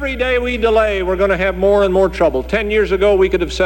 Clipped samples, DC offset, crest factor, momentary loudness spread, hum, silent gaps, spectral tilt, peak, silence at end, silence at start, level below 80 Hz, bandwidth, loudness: under 0.1%; under 0.1%; 12 dB; 4 LU; none; none; -6 dB/octave; -2 dBFS; 0 s; 0 s; -28 dBFS; 17 kHz; -15 LUFS